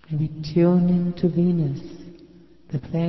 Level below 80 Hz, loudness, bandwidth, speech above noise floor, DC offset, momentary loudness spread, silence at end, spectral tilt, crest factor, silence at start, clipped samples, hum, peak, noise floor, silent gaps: -50 dBFS; -22 LUFS; 6 kHz; 28 dB; under 0.1%; 16 LU; 0 s; -10 dB/octave; 14 dB; 0.1 s; under 0.1%; none; -8 dBFS; -49 dBFS; none